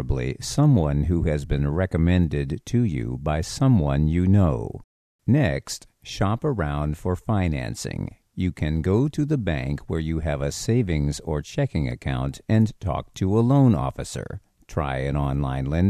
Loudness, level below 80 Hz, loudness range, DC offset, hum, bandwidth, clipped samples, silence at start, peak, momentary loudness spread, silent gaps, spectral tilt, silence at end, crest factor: -24 LUFS; -34 dBFS; 3 LU; under 0.1%; none; 13.5 kHz; under 0.1%; 0 s; -6 dBFS; 11 LU; 4.84-5.19 s; -7 dB/octave; 0 s; 16 dB